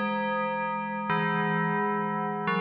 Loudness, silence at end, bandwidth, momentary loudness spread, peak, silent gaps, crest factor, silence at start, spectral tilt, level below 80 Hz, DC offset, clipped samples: -28 LUFS; 0 s; 5 kHz; 4 LU; -16 dBFS; none; 12 dB; 0 s; -4.5 dB/octave; -72 dBFS; under 0.1%; under 0.1%